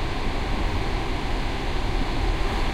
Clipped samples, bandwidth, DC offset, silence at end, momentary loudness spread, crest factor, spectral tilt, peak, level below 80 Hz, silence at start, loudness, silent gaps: under 0.1%; 12 kHz; under 0.1%; 0 s; 2 LU; 12 dB; -5.5 dB/octave; -12 dBFS; -26 dBFS; 0 s; -28 LUFS; none